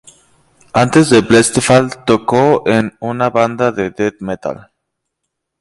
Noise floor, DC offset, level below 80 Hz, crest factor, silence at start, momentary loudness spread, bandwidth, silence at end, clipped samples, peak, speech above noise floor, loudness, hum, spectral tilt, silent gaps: -75 dBFS; under 0.1%; -46 dBFS; 14 dB; 0.75 s; 13 LU; 11.5 kHz; 1.05 s; under 0.1%; 0 dBFS; 62 dB; -13 LUFS; none; -5 dB/octave; none